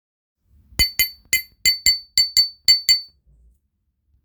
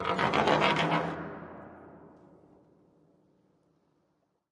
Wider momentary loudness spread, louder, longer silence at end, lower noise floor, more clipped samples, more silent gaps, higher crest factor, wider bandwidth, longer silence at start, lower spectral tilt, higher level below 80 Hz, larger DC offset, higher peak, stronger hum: second, 7 LU vs 24 LU; first, -17 LUFS vs -27 LUFS; second, 1.2 s vs 2.45 s; second, -71 dBFS vs -75 dBFS; neither; neither; about the same, 20 dB vs 22 dB; first, over 20 kHz vs 11.5 kHz; first, 0.8 s vs 0 s; second, 1 dB/octave vs -5 dB/octave; first, -42 dBFS vs -66 dBFS; neither; first, -2 dBFS vs -10 dBFS; neither